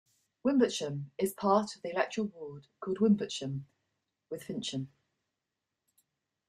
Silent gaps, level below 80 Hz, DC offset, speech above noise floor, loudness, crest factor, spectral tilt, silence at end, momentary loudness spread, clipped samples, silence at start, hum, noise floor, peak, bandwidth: none; -76 dBFS; under 0.1%; 56 dB; -32 LUFS; 20 dB; -5.5 dB/octave; 1.6 s; 16 LU; under 0.1%; 0.45 s; none; -88 dBFS; -14 dBFS; 14.5 kHz